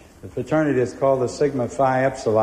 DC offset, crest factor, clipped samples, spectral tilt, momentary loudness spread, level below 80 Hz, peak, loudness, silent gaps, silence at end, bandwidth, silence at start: under 0.1%; 14 dB; under 0.1%; -6.5 dB/octave; 4 LU; -50 dBFS; -6 dBFS; -21 LUFS; none; 0 s; 14 kHz; 0.25 s